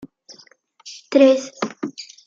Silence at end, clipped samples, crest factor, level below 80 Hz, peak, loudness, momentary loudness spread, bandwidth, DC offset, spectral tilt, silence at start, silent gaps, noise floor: 0.25 s; under 0.1%; 18 dB; -74 dBFS; -2 dBFS; -18 LUFS; 23 LU; 7.6 kHz; under 0.1%; -4 dB/octave; 0.85 s; none; -52 dBFS